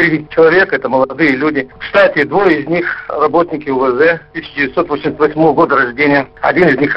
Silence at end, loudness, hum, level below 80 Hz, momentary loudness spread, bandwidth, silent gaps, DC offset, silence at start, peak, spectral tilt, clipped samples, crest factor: 0 s; -12 LUFS; none; -46 dBFS; 6 LU; 5.8 kHz; none; under 0.1%; 0 s; 0 dBFS; -8 dB/octave; under 0.1%; 12 dB